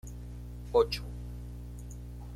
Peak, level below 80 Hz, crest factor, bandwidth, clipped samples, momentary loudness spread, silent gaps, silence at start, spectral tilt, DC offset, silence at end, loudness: -14 dBFS; -44 dBFS; 22 dB; 16 kHz; under 0.1%; 17 LU; none; 0.05 s; -5.5 dB/octave; under 0.1%; 0 s; -33 LUFS